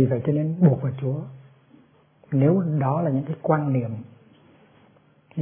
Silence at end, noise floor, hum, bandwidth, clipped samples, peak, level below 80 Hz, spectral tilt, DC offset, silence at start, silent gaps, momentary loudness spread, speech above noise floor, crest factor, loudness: 0 s; -57 dBFS; none; 3.5 kHz; under 0.1%; -4 dBFS; -64 dBFS; -13.5 dB/octave; under 0.1%; 0 s; none; 13 LU; 35 dB; 20 dB; -23 LUFS